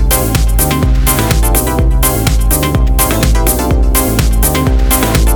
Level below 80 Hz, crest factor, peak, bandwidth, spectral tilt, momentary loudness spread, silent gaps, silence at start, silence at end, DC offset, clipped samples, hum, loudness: -12 dBFS; 10 dB; 0 dBFS; over 20 kHz; -4.5 dB/octave; 2 LU; none; 0 s; 0 s; under 0.1%; under 0.1%; none; -11 LUFS